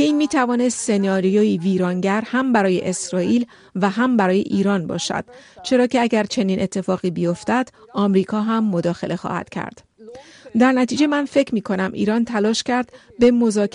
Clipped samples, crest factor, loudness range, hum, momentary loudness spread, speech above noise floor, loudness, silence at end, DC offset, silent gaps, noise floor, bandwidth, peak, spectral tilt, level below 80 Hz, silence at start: under 0.1%; 14 dB; 3 LU; none; 8 LU; 22 dB; -19 LUFS; 0.05 s; under 0.1%; none; -41 dBFS; 11 kHz; -4 dBFS; -5.5 dB/octave; -58 dBFS; 0 s